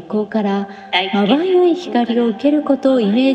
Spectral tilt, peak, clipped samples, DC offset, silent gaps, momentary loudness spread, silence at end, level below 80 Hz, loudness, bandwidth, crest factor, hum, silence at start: -7 dB/octave; -2 dBFS; under 0.1%; under 0.1%; none; 5 LU; 0 s; -66 dBFS; -16 LUFS; 8.4 kHz; 14 dB; none; 0 s